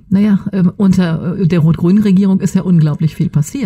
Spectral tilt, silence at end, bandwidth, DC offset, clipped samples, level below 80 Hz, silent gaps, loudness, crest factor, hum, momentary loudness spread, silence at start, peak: -8 dB/octave; 0 s; 13 kHz; under 0.1%; under 0.1%; -40 dBFS; none; -12 LUFS; 10 dB; none; 5 LU; 0.1 s; -2 dBFS